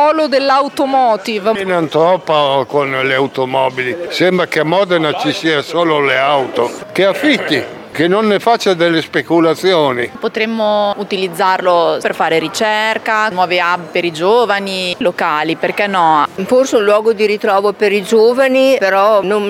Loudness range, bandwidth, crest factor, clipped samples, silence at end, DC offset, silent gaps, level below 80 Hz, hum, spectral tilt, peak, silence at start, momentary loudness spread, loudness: 2 LU; 16.5 kHz; 12 dB; under 0.1%; 0 s; under 0.1%; none; -62 dBFS; none; -4.5 dB/octave; 0 dBFS; 0 s; 5 LU; -13 LUFS